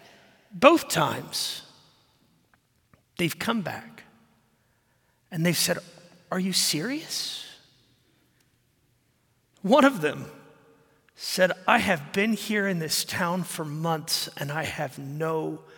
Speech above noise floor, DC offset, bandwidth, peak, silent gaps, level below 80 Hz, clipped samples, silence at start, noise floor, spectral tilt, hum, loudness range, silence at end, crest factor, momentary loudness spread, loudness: 42 dB; under 0.1%; 17 kHz; -2 dBFS; none; -68 dBFS; under 0.1%; 0.55 s; -68 dBFS; -3.5 dB/octave; none; 8 LU; 0.15 s; 26 dB; 16 LU; -25 LUFS